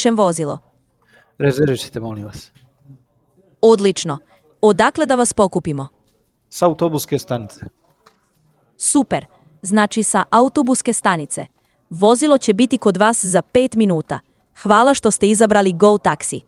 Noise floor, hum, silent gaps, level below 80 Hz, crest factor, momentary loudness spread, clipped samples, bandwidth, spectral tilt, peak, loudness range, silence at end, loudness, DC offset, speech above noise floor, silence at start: -62 dBFS; none; none; -52 dBFS; 16 dB; 15 LU; under 0.1%; 15 kHz; -4.5 dB/octave; 0 dBFS; 7 LU; 0.1 s; -16 LUFS; under 0.1%; 46 dB; 0 s